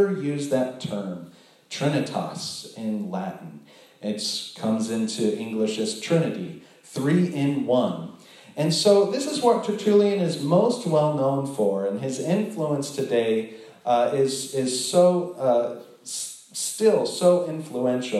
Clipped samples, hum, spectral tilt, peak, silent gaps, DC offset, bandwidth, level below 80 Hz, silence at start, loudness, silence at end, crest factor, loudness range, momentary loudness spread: under 0.1%; none; -5 dB/octave; -6 dBFS; none; under 0.1%; 13.5 kHz; -78 dBFS; 0 s; -24 LUFS; 0 s; 18 dB; 7 LU; 13 LU